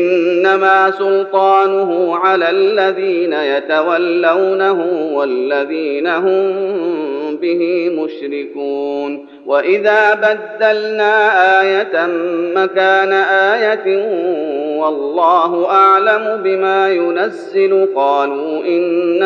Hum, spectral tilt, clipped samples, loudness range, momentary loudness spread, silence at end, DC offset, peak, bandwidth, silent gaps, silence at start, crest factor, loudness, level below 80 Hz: none; -5.5 dB/octave; under 0.1%; 4 LU; 8 LU; 0 s; under 0.1%; 0 dBFS; 6.6 kHz; none; 0 s; 14 dB; -14 LUFS; -74 dBFS